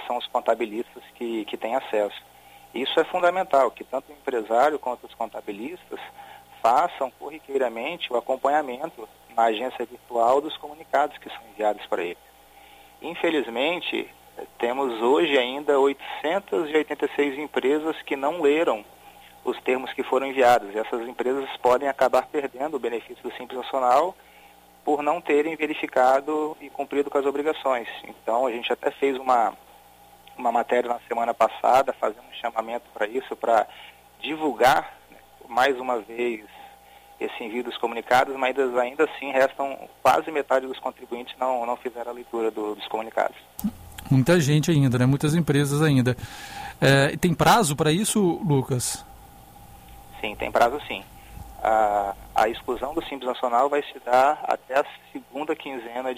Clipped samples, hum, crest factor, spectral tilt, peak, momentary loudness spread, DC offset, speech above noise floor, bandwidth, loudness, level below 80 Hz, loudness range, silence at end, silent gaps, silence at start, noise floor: under 0.1%; none; 18 dB; -5 dB/octave; -6 dBFS; 14 LU; under 0.1%; 28 dB; 15.5 kHz; -24 LUFS; -56 dBFS; 5 LU; 0 s; none; 0 s; -52 dBFS